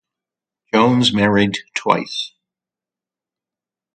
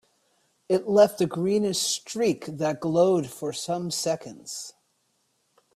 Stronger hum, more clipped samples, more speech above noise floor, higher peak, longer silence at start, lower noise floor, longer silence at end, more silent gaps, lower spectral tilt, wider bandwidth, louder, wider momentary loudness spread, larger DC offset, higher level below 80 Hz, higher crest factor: neither; neither; first, 73 dB vs 47 dB; first, 0 dBFS vs -8 dBFS; about the same, 0.75 s vs 0.7 s; first, -89 dBFS vs -71 dBFS; first, 1.7 s vs 1.05 s; neither; about the same, -5 dB/octave vs -4.5 dB/octave; second, 9.2 kHz vs 14.5 kHz; first, -17 LUFS vs -25 LUFS; second, 11 LU vs 15 LU; neither; first, -54 dBFS vs -68 dBFS; about the same, 20 dB vs 18 dB